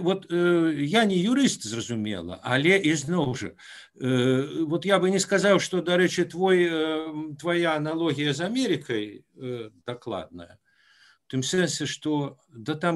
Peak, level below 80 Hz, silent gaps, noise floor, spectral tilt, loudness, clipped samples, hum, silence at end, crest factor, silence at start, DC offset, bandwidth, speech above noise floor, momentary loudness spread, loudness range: -6 dBFS; -66 dBFS; none; -59 dBFS; -5 dB/octave; -25 LUFS; under 0.1%; none; 0 s; 18 dB; 0 s; under 0.1%; 12.5 kHz; 34 dB; 14 LU; 8 LU